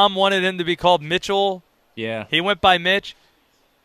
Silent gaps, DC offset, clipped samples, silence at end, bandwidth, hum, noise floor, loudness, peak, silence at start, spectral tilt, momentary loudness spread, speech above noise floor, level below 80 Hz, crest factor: none; under 0.1%; under 0.1%; 0.7 s; 14.5 kHz; none; -61 dBFS; -19 LUFS; -2 dBFS; 0 s; -4 dB/octave; 12 LU; 42 dB; -50 dBFS; 18 dB